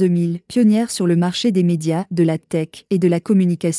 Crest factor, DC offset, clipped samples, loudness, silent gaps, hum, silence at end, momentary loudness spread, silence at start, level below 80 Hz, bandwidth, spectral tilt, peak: 12 dB; under 0.1%; under 0.1%; -18 LUFS; none; none; 0 s; 6 LU; 0 s; -64 dBFS; 12 kHz; -6.5 dB/octave; -4 dBFS